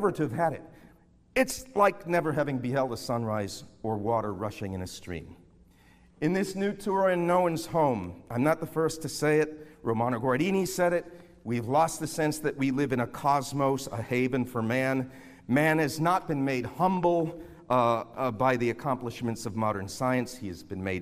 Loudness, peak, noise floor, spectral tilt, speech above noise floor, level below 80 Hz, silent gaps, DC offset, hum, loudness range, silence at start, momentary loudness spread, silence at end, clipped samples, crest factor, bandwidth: -28 LUFS; -10 dBFS; -59 dBFS; -6 dB/octave; 31 dB; -58 dBFS; none; under 0.1%; none; 4 LU; 0 s; 10 LU; 0 s; under 0.1%; 18 dB; 15.5 kHz